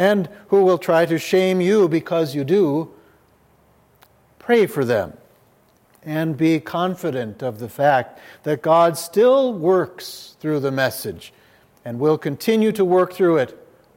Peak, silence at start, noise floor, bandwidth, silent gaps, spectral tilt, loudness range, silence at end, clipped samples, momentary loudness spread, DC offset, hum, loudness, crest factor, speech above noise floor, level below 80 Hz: -2 dBFS; 0 s; -57 dBFS; 16.5 kHz; none; -6 dB/octave; 5 LU; 0.45 s; under 0.1%; 15 LU; under 0.1%; none; -19 LUFS; 18 dB; 38 dB; -66 dBFS